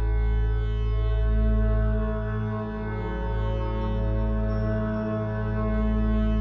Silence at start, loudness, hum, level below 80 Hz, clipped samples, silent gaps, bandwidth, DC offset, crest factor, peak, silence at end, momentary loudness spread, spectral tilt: 0 s; -27 LUFS; none; -26 dBFS; under 0.1%; none; 5.2 kHz; under 0.1%; 10 dB; -14 dBFS; 0 s; 5 LU; -10 dB/octave